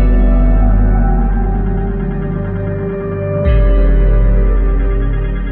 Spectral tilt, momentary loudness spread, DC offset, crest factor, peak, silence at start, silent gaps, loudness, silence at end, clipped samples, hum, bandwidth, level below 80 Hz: -12.5 dB/octave; 6 LU; under 0.1%; 10 dB; -2 dBFS; 0 s; none; -15 LUFS; 0 s; under 0.1%; none; 3.3 kHz; -12 dBFS